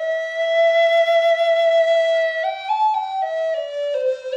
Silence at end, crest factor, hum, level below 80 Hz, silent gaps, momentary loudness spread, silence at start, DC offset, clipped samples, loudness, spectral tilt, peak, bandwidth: 0 s; 10 dB; none; -78 dBFS; none; 8 LU; 0 s; under 0.1%; under 0.1%; -18 LUFS; 1.5 dB/octave; -8 dBFS; 7.8 kHz